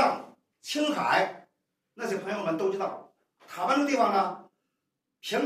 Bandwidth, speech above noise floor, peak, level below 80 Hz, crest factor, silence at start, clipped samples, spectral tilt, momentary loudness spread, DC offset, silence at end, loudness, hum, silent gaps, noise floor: 15.5 kHz; 55 dB; -10 dBFS; -86 dBFS; 20 dB; 0 s; under 0.1%; -4 dB/octave; 17 LU; under 0.1%; 0 s; -28 LUFS; none; none; -83 dBFS